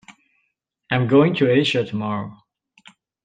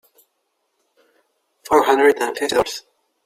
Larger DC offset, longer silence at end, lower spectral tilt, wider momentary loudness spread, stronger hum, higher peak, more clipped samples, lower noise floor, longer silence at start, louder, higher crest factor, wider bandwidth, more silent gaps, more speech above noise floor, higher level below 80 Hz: neither; first, 0.9 s vs 0.45 s; first, -7 dB/octave vs -3 dB/octave; about the same, 12 LU vs 10 LU; neither; about the same, -4 dBFS vs -2 dBFS; neither; about the same, -73 dBFS vs -71 dBFS; second, 0.1 s vs 1.65 s; about the same, -19 LUFS vs -17 LUFS; about the same, 18 dB vs 20 dB; second, 9.2 kHz vs 16 kHz; neither; about the same, 55 dB vs 55 dB; about the same, -62 dBFS vs -58 dBFS